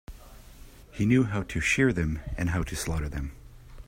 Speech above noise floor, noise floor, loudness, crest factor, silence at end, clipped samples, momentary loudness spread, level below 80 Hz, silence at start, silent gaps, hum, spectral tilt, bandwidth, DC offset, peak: 22 dB; -48 dBFS; -27 LUFS; 18 dB; 0.05 s; under 0.1%; 12 LU; -40 dBFS; 0.1 s; none; none; -5.5 dB/octave; 16 kHz; under 0.1%; -10 dBFS